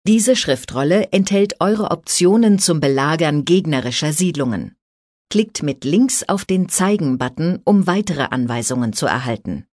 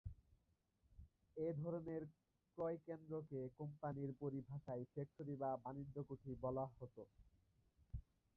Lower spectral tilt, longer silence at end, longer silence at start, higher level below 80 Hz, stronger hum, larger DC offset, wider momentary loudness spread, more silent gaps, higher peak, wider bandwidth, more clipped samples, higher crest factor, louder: second, -4.5 dB/octave vs -11 dB/octave; second, 0.1 s vs 0.35 s; about the same, 0.05 s vs 0.05 s; first, -52 dBFS vs -68 dBFS; neither; neither; second, 7 LU vs 14 LU; first, 4.82-5.25 s vs none; first, -2 dBFS vs -34 dBFS; first, 11 kHz vs 4.2 kHz; neither; about the same, 14 dB vs 16 dB; first, -17 LUFS vs -50 LUFS